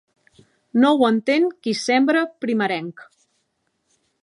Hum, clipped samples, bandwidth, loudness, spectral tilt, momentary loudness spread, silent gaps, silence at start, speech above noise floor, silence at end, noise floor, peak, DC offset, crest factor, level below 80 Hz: none; under 0.1%; 11 kHz; -19 LUFS; -4.5 dB/octave; 8 LU; none; 0.75 s; 52 dB; 1.2 s; -71 dBFS; -4 dBFS; under 0.1%; 18 dB; -76 dBFS